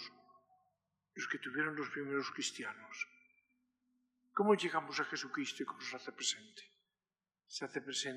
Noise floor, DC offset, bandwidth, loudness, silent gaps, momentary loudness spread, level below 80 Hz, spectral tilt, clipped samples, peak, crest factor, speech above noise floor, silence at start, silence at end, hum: under -90 dBFS; under 0.1%; 13 kHz; -39 LUFS; none; 13 LU; under -90 dBFS; -2.5 dB/octave; under 0.1%; -18 dBFS; 24 dB; over 50 dB; 0 s; 0 s; none